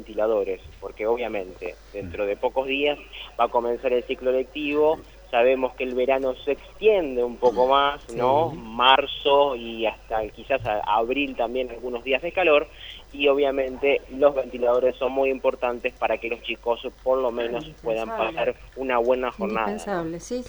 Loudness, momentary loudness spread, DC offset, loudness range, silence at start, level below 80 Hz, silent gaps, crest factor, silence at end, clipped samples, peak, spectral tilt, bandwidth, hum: -24 LUFS; 10 LU; under 0.1%; 5 LU; 0 s; -48 dBFS; none; 22 dB; 0 s; under 0.1%; -2 dBFS; -5 dB/octave; over 20 kHz; none